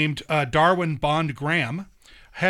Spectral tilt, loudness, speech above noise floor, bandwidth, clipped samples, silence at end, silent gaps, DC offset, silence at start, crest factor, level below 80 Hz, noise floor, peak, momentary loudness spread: -6 dB/octave; -22 LUFS; 20 dB; 12 kHz; under 0.1%; 0 s; none; under 0.1%; 0 s; 18 dB; -48 dBFS; -42 dBFS; -6 dBFS; 11 LU